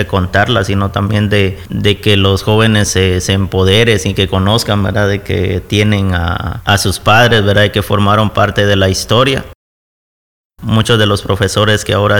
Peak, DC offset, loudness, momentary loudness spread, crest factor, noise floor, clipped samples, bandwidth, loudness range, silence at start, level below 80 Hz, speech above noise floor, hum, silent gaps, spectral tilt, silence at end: 0 dBFS; 1%; -11 LUFS; 6 LU; 12 dB; under -90 dBFS; under 0.1%; 18.5 kHz; 3 LU; 0 s; -32 dBFS; over 79 dB; none; 9.55-10.50 s; -5 dB/octave; 0 s